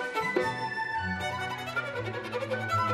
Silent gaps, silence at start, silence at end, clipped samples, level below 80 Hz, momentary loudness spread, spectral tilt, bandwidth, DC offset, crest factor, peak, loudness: none; 0 s; 0 s; under 0.1%; -60 dBFS; 6 LU; -5 dB/octave; 14 kHz; under 0.1%; 16 dB; -14 dBFS; -31 LUFS